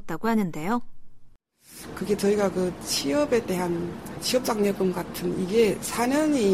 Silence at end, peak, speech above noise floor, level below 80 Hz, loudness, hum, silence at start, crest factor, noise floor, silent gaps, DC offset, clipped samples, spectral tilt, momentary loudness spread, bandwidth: 0 s; -8 dBFS; 26 dB; -52 dBFS; -25 LUFS; none; 0 s; 16 dB; -51 dBFS; none; 0.2%; under 0.1%; -4.5 dB/octave; 8 LU; 16 kHz